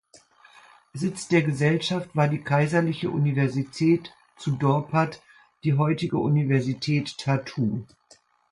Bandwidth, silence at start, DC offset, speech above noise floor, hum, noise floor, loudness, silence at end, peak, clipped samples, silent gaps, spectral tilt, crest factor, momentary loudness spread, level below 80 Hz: 11 kHz; 0.95 s; under 0.1%; 35 dB; none; -59 dBFS; -25 LUFS; 0.65 s; -8 dBFS; under 0.1%; none; -7 dB/octave; 18 dB; 8 LU; -62 dBFS